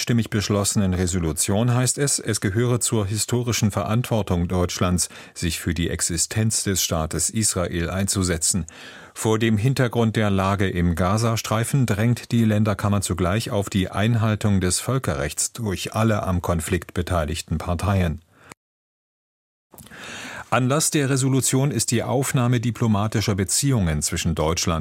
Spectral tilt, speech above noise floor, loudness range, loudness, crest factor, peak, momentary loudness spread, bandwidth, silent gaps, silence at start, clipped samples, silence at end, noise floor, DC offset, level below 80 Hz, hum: -4.5 dB/octave; over 69 dB; 4 LU; -22 LUFS; 18 dB; -4 dBFS; 5 LU; 16.5 kHz; 18.57-19.70 s; 0 s; under 0.1%; 0 s; under -90 dBFS; under 0.1%; -40 dBFS; none